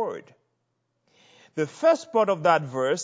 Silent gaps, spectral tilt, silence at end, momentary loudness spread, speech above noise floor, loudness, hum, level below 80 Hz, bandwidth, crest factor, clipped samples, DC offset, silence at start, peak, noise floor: none; -5 dB/octave; 0 s; 13 LU; 52 dB; -23 LUFS; none; -80 dBFS; 8 kHz; 20 dB; under 0.1%; under 0.1%; 0 s; -6 dBFS; -76 dBFS